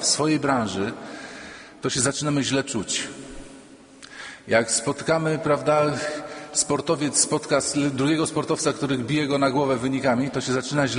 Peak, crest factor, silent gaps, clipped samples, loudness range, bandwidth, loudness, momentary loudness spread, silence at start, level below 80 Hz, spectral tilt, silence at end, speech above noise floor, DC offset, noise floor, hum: -4 dBFS; 20 dB; none; under 0.1%; 4 LU; 10.5 kHz; -23 LUFS; 16 LU; 0 s; -56 dBFS; -3.5 dB/octave; 0 s; 24 dB; under 0.1%; -46 dBFS; none